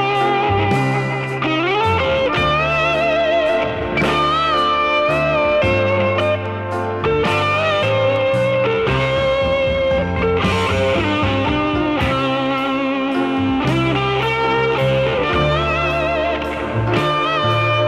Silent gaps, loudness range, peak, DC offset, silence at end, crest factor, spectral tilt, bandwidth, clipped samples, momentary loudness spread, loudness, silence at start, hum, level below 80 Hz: none; 2 LU; -4 dBFS; under 0.1%; 0 s; 12 dB; -6.5 dB/octave; 13 kHz; under 0.1%; 3 LU; -17 LUFS; 0 s; none; -36 dBFS